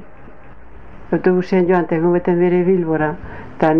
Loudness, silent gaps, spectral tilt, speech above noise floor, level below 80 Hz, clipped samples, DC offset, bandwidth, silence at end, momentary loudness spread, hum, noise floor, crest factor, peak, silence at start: -16 LUFS; none; -10 dB/octave; 25 dB; -44 dBFS; under 0.1%; 2%; 6 kHz; 0 s; 8 LU; none; -41 dBFS; 16 dB; -2 dBFS; 0 s